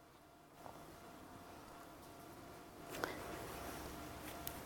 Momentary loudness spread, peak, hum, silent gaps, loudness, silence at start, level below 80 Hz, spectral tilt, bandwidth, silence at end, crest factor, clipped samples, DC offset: 11 LU; -20 dBFS; none; none; -51 LUFS; 0 s; -64 dBFS; -4 dB/octave; 17.5 kHz; 0 s; 32 dB; under 0.1%; under 0.1%